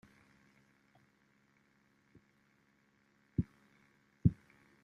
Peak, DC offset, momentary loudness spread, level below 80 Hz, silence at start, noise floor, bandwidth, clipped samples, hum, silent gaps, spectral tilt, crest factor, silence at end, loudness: -14 dBFS; under 0.1%; 14 LU; -58 dBFS; 3.4 s; -73 dBFS; 6.4 kHz; under 0.1%; none; none; -10.5 dB/octave; 30 dB; 0.5 s; -37 LUFS